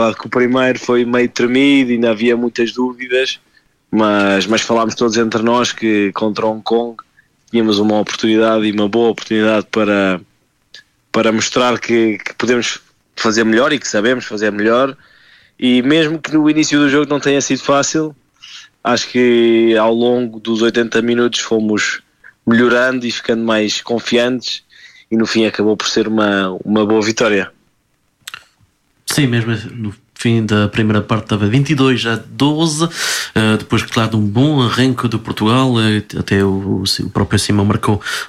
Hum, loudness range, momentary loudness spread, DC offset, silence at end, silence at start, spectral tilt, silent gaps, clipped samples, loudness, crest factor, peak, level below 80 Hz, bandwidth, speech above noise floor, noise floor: none; 2 LU; 7 LU; under 0.1%; 0 s; 0 s; -5 dB/octave; none; under 0.1%; -14 LUFS; 14 dB; -2 dBFS; -50 dBFS; 14.5 kHz; 47 dB; -61 dBFS